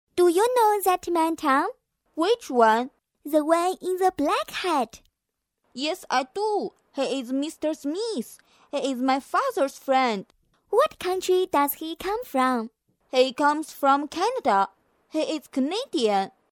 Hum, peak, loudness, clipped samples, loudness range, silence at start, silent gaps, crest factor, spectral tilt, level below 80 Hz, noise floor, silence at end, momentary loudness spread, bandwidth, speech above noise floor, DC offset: none; -6 dBFS; -24 LUFS; under 0.1%; 5 LU; 0.15 s; none; 20 dB; -3.5 dB/octave; -64 dBFS; -82 dBFS; 0.2 s; 10 LU; 18 kHz; 58 dB; under 0.1%